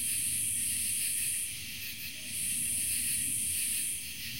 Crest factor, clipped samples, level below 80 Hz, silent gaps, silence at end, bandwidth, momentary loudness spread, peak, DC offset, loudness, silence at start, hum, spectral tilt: 16 dB; under 0.1%; -60 dBFS; none; 0 s; 16.5 kHz; 8 LU; -18 dBFS; 0.3%; -30 LUFS; 0 s; none; 0.5 dB/octave